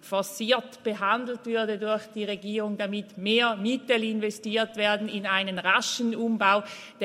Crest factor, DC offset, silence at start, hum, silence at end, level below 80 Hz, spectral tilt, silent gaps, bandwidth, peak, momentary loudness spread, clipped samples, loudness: 20 dB; under 0.1%; 0.05 s; none; 0 s; -80 dBFS; -3.5 dB/octave; none; 16 kHz; -8 dBFS; 8 LU; under 0.1%; -26 LUFS